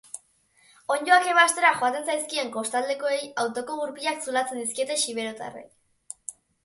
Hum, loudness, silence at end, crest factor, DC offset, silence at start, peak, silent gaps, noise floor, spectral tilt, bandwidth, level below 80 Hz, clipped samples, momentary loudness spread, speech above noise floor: none; -24 LUFS; 0.35 s; 20 dB; under 0.1%; 0.15 s; -6 dBFS; none; -62 dBFS; -0.5 dB/octave; 12 kHz; -76 dBFS; under 0.1%; 21 LU; 37 dB